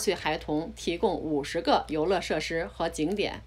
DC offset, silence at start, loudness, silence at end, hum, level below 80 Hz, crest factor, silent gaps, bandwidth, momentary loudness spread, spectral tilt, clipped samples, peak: under 0.1%; 0 s; -29 LUFS; 0 s; none; -48 dBFS; 18 dB; none; 15.5 kHz; 6 LU; -4.5 dB/octave; under 0.1%; -10 dBFS